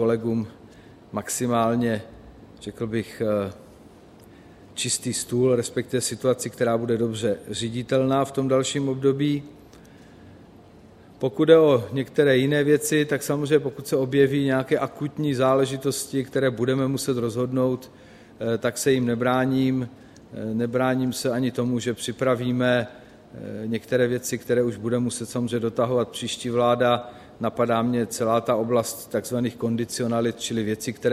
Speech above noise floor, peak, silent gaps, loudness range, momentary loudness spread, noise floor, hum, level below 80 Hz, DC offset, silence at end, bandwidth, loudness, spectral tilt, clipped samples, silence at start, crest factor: 26 dB; -2 dBFS; none; 6 LU; 9 LU; -49 dBFS; none; -60 dBFS; under 0.1%; 0 s; 15.5 kHz; -24 LUFS; -5 dB/octave; under 0.1%; 0 s; 22 dB